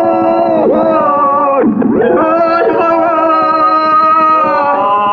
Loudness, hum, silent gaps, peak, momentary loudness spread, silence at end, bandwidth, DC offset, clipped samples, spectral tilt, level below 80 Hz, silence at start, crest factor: -9 LUFS; none; none; -2 dBFS; 3 LU; 0 s; 6.4 kHz; under 0.1%; under 0.1%; -8 dB/octave; -50 dBFS; 0 s; 6 dB